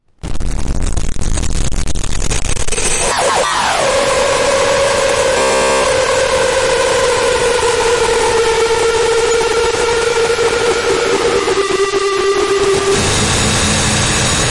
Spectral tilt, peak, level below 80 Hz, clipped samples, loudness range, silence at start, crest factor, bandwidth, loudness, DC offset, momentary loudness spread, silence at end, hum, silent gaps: -3 dB/octave; -4 dBFS; -24 dBFS; under 0.1%; 3 LU; 0 s; 10 dB; 11.5 kHz; -13 LUFS; under 0.1%; 8 LU; 0 s; none; none